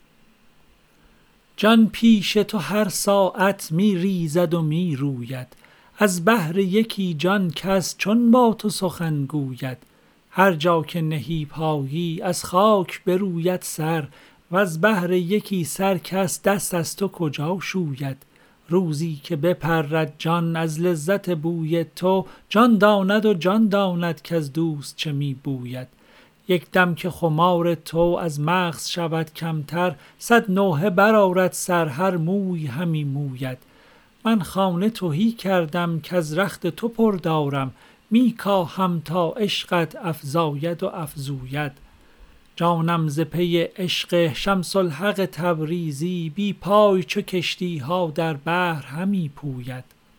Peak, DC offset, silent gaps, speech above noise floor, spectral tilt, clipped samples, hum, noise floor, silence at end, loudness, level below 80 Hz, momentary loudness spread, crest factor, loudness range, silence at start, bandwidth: -2 dBFS; under 0.1%; none; 35 dB; -5.5 dB/octave; under 0.1%; none; -56 dBFS; 0.35 s; -22 LUFS; -54 dBFS; 10 LU; 20 dB; 5 LU; 1.6 s; over 20 kHz